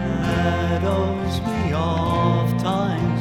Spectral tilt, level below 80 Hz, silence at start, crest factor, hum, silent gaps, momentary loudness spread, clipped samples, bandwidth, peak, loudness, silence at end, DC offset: -7 dB/octave; -40 dBFS; 0 s; 14 dB; none; none; 4 LU; under 0.1%; 16.5 kHz; -8 dBFS; -21 LUFS; 0 s; under 0.1%